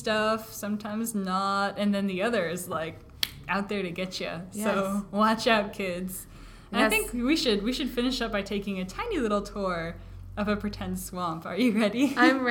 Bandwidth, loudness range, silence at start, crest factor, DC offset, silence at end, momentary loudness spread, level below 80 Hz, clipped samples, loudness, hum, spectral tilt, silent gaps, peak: 18 kHz; 4 LU; 0 s; 26 dB; under 0.1%; 0 s; 10 LU; -48 dBFS; under 0.1%; -28 LUFS; none; -4.5 dB/octave; none; -2 dBFS